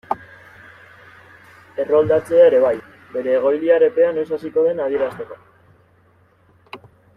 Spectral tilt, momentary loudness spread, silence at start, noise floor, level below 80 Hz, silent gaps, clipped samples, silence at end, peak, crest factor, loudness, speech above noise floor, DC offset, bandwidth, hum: -7 dB/octave; 21 LU; 0.1 s; -55 dBFS; -62 dBFS; none; under 0.1%; 0.4 s; -2 dBFS; 16 dB; -18 LUFS; 39 dB; under 0.1%; 10.5 kHz; none